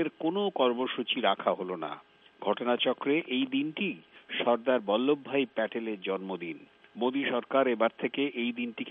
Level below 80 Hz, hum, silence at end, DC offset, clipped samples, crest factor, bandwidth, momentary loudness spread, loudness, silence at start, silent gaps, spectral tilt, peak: -82 dBFS; none; 0 s; under 0.1%; under 0.1%; 18 dB; 4 kHz; 10 LU; -30 LUFS; 0 s; none; -8 dB/octave; -12 dBFS